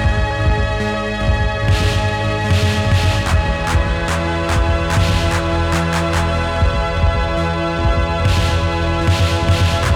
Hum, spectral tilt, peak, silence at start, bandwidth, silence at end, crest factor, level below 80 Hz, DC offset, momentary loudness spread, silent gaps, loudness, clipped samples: none; -5.5 dB/octave; -2 dBFS; 0 s; 14 kHz; 0 s; 12 dB; -22 dBFS; under 0.1%; 3 LU; none; -17 LUFS; under 0.1%